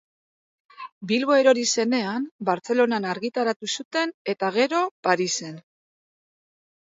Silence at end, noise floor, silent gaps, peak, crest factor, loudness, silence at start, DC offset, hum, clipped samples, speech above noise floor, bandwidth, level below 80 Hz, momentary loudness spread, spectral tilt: 1.25 s; under -90 dBFS; 0.92-1.01 s, 2.31-2.39 s, 3.56-3.60 s, 3.85-3.91 s, 4.14-4.25 s, 4.91-5.03 s; -4 dBFS; 20 dB; -23 LUFS; 0.8 s; under 0.1%; none; under 0.1%; over 67 dB; 8 kHz; -76 dBFS; 10 LU; -3 dB/octave